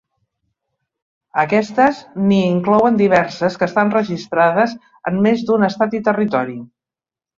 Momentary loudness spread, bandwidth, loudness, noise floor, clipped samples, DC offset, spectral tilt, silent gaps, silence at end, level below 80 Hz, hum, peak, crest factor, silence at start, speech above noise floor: 7 LU; 7.4 kHz; -16 LUFS; -90 dBFS; under 0.1%; under 0.1%; -7 dB/octave; none; 0.7 s; -58 dBFS; none; 0 dBFS; 16 dB; 1.35 s; 74 dB